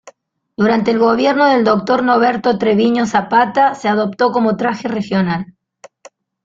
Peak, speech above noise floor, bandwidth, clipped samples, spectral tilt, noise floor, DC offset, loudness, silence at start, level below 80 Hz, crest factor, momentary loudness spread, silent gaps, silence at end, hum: 0 dBFS; 31 dB; 7.6 kHz; under 0.1%; -6.5 dB/octave; -45 dBFS; under 0.1%; -14 LUFS; 0.05 s; -56 dBFS; 14 dB; 6 LU; none; 1 s; none